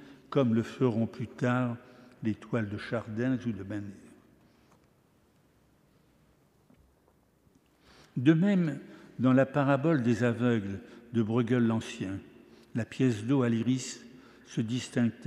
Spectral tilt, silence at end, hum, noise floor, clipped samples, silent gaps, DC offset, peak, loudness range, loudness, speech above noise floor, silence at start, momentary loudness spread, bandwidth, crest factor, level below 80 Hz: -7 dB/octave; 0 s; none; -66 dBFS; under 0.1%; none; under 0.1%; -10 dBFS; 10 LU; -30 LUFS; 38 dB; 0 s; 14 LU; 11 kHz; 20 dB; -70 dBFS